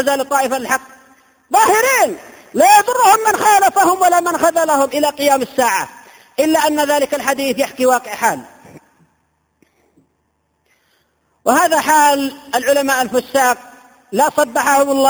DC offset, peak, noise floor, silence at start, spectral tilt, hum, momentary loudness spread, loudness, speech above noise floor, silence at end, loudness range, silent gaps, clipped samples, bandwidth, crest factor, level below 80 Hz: under 0.1%; 0 dBFS; -65 dBFS; 0 s; -2 dB/octave; none; 9 LU; -14 LUFS; 51 dB; 0 s; 9 LU; none; under 0.1%; over 20 kHz; 16 dB; -58 dBFS